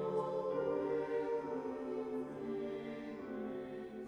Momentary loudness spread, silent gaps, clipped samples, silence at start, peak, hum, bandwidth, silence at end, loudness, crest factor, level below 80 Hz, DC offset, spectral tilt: 8 LU; none; under 0.1%; 0 s; -26 dBFS; none; 10 kHz; 0 s; -40 LUFS; 14 dB; -72 dBFS; under 0.1%; -7.5 dB/octave